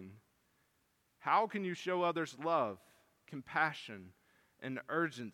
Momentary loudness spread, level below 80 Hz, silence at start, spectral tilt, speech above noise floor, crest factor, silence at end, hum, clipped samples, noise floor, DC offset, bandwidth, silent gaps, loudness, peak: 18 LU; -84 dBFS; 0 s; -5.5 dB/octave; 41 dB; 22 dB; 0.05 s; none; under 0.1%; -77 dBFS; under 0.1%; 16.5 kHz; none; -36 LUFS; -18 dBFS